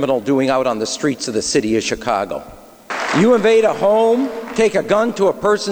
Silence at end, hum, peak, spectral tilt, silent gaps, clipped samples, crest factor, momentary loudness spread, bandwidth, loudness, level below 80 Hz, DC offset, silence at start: 0 s; none; -4 dBFS; -4.5 dB/octave; none; under 0.1%; 12 dB; 7 LU; over 20 kHz; -16 LUFS; -50 dBFS; under 0.1%; 0 s